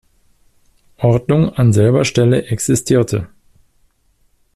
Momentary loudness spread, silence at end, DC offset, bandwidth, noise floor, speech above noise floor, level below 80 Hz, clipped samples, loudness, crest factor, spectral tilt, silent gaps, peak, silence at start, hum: 7 LU; 1.3 s; under 0.1%; 13.5 kHz; -58 dBFS; 44 dB; -44 dBFS; under 0.1%; -15 LUFS; 14 dB; -6.5 dB/octave; none; -2 dBFS; 1 s; none